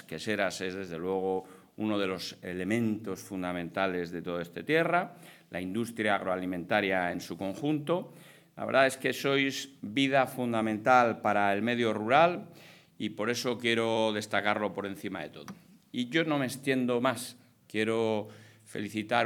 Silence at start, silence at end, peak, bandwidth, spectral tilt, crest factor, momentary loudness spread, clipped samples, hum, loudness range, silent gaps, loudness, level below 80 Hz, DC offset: 0.1 s; 0 s; -8 dBFS; 19 kHz; -5 dB/octave; 22 dB; 13 LU; under 0.1%; none; 6 LU; none; -30 LUFS; -78 dBFS; under 0.1%